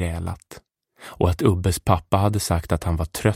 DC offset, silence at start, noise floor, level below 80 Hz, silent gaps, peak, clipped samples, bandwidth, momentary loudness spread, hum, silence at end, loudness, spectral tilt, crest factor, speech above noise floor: under 0.1%; 0 s; -49 dBFS; -36 dBFS; none; -2 dBFS; under 0.1%; 16.5 kHz; 12 LU; none; 0 s; -22 LUFS; -6 dB/octave; 20 dB; 28 dB